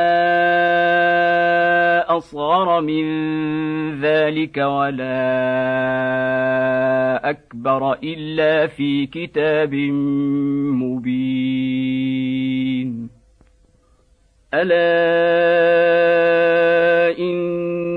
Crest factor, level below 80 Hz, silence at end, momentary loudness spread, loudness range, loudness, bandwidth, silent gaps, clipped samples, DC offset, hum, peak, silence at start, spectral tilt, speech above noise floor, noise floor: 12 dB; -56 dBFS; 0 s; 7 LU; 6 LU; -18 LUFS; 5.2 kHz; none; under 0.1%; under 0.1%; none; -4 dBFS; 0 s; -8 dB/octave; 38 dB; -56 dBFS